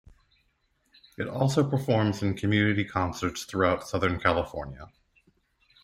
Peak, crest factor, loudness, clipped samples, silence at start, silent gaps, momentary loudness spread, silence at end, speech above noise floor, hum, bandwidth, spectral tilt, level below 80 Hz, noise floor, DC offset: -8 dBFS; 20 dB; -27 LUFS; under 0.1%; 1.2 s; none; 11 LU; 1 s; 45 dB; none; 16 kHz; -6 dB/octave; -54 dBFS; -71 dBFS; under 0.1%